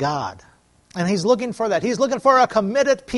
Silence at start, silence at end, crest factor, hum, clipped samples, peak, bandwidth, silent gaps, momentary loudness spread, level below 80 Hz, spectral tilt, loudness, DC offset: 0 s; 0 s; 16 dB; none; under 0.1%; -2 dBFS; 11.5 kHz; none; 11 LU; -56 dBFS; -5 dB/octave; -19 LUFS; under 0.1%